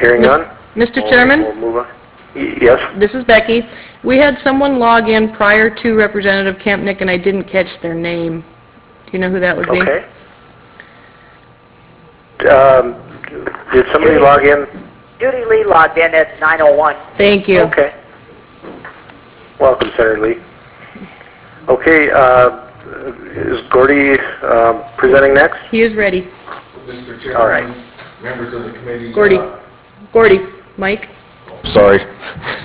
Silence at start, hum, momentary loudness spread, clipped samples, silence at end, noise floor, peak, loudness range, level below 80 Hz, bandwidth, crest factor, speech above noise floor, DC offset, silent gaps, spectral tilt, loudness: 0 s; none; 19 LU; 0.2%; 0 s; -43 dBFS; 0 dBFS; 7 LU; -40 dBFS; 4 kHz; 12 dB; 32 dB; under 0.1%; none; -9 dB/octave; -11 LUFS